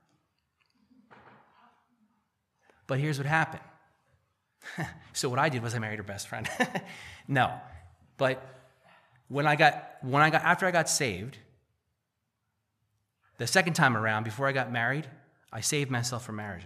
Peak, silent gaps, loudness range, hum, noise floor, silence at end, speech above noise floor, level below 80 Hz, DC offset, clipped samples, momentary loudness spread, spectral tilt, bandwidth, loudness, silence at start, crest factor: -6 dBFS; none; 8 LU; none; -82 dBFS; 0 s; 53 dB; -68 dBFS; under 0.1%; under 0.1%; 16 LU; -4 dB/octave; 15 kHz; -28 LUFS; 2.9 s; 26 dB